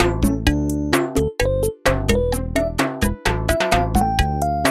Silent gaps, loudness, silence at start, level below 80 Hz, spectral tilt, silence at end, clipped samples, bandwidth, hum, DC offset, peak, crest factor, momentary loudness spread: none; -20 LUFS; 0 s; -26 dBFS; -5 dB/octave; 0 s; under 0.1%; 16 kHz; none; under 0.1%; -2 dBFS; 18 dB; 3 LU